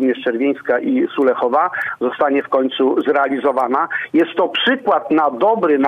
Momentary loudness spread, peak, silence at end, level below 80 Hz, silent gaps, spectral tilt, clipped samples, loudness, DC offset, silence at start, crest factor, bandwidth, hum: 3 LU; -4 dBFS; 0 s; -66 dBFS; none; -6 dB/octave; under 0.1%; -17 LUFS; under 0.1%; 0 s; 12 dB; 5 kHz; none